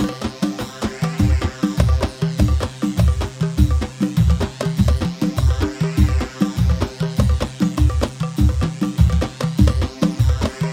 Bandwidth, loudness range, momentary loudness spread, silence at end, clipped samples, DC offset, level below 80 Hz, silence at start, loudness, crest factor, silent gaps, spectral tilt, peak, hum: 15.5 kHz; 1 LU; 5 LU; 0 s; under 0.1%; under 0.1%; -22 dBFS; 0 s; -19 LUFS; 16 dB; none; -7 dB/octave; -2 dBFS; none